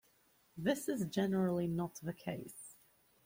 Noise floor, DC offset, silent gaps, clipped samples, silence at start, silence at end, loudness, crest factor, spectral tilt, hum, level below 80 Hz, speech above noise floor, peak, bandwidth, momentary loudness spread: -72 dBFS; under 0.1%; none; under 0.1%; 0.55 s; 0.55 s; -38 LUFS; 20 dB; -6 dB/octave; none; -70 dBFS; 35 dB; -20 dBFS; 16.5 kHz; 17 LU